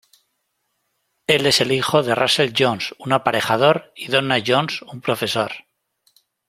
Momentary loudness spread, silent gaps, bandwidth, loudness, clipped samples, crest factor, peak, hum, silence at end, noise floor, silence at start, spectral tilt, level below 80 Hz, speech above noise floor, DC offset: 10 LU; none; 16.5 kHz; -19 LUFS; under 0.1%; 20 dB; -2 dBFS; none; 0.9 s; -72 dBFS; 1.3 s; -4 dB/octave; -60 dBFS; 53 dB; under 0.1%